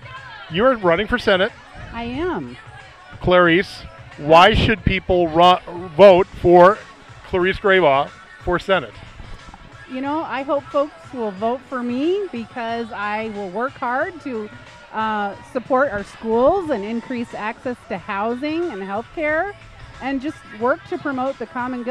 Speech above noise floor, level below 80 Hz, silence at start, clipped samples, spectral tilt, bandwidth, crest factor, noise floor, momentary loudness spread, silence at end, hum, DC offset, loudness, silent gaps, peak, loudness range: 22 dB; -40 dBFS; 0 s; under 0.1%; -6.5 dB/octave; 11 kHz; 18 dB; -40 dBFS; 17 LU; 0 s; none; under 0.1%; -19 LUFS; none; 0 dBFS; 10 LU